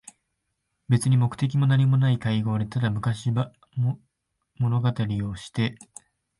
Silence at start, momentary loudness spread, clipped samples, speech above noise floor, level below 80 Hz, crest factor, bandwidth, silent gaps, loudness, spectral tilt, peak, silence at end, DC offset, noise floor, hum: 0.9 s; 9 LU; under 0.1%; 55 dB; -54 dBFS; 16 dB; 11.5 kHz; none; -25 LUFS; -7 dB/octave; -8 dBFS; 0.65 s; under 0.1%; -78 dBFS; none